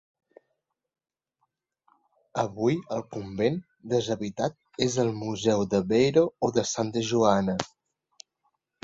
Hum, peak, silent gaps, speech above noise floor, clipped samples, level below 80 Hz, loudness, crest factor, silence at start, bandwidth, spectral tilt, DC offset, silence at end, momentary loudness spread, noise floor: none; -4 dBFS; none; over 64 dB; under 0.1%; -60 dBFS; -27 LUFS; 24 dB; 2.35 s; 8 kHz; -5.5 dB/octave; under 0.1%; 1.15 s; 11 LU; under -90 dBFS